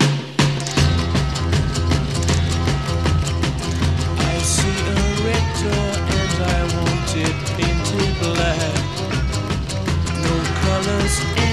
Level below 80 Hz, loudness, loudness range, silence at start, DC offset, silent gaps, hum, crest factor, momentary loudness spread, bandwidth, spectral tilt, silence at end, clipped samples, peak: -26 dBFS; -19 LUFS; 1 LU; 0 s; 0.5%; none; none; 16 dB; 4 LU; 13.5 kHz; -5 dB/octave; 0 s; under 0.1%; -2 dBFS